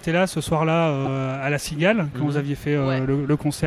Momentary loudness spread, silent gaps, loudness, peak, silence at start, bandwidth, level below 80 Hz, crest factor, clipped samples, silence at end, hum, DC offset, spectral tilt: 4 LU; none; -22 LUFS; -6 dBFS; 0 s; 14.5 kHz; -48 dBFS; 16 dB; under 0.1%; 0 s; none; under 0.1%; -6 dB/octave